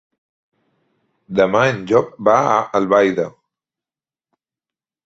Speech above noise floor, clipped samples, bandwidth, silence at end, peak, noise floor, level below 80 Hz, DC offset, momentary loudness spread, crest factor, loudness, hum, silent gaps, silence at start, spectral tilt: over 74 dB; under 0.1%; 7.8 kHz; 1.75 s; 0 dBFS; under -90 dBFS; -58 dBFS; under 0.1%; 8 LU; 18 dB; -16 LUFS; none; none; 1.3 s; -6 dB/octave